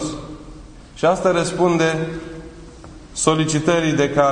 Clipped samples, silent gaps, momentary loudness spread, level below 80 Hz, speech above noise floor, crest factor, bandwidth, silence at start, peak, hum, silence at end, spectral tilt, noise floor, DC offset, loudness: under 0.1%; none; 21 LU; -42 dBFS; 22 dB; 20 dB; 10.5 kHz; 0 s; 0 dBFS; none; 0 s; -5 dB/octave; -39 dBFS; under 0.1%; -18 LUFS